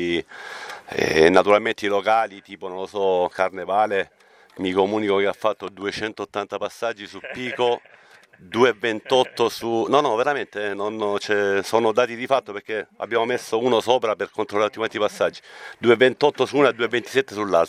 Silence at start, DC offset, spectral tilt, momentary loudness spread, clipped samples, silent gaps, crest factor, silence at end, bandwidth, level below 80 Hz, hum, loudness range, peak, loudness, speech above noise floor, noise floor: 0 s; under 0.1%; -4.5 dB/octave; 11 LU; under 0.1%; none; 22 dB; 0 s; 15 kHz; -60 dBFS; none; 5 LU; 0 dBFS; -22 LUFS; 29 dB; -51 dBFS